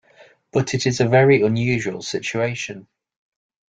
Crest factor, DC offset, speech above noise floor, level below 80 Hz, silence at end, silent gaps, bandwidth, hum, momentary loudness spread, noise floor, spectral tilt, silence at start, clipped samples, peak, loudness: 18 dB; under 0.1%; 33 dB; -56 dBFS; 0.9 s; none; 9.2 kHz; none; 13 LU; -52 dBFS; -5.5 dB/octave; 0.55 s; under 0.1%; -2 dBFS; -19 LUFS